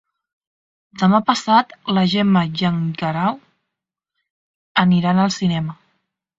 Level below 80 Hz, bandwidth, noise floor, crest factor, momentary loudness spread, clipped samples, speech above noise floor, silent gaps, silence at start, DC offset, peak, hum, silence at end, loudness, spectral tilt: -56 dBFS; 7.8 kHz; -82 dBFS; 18 dB; 7 LU; under 0.1%; 65 dB; 4.30-4.75 s; 0.95 s; under 0.1%; 0 dBFS; none; 0.65 s; -18 LUFS; -6 dB/octave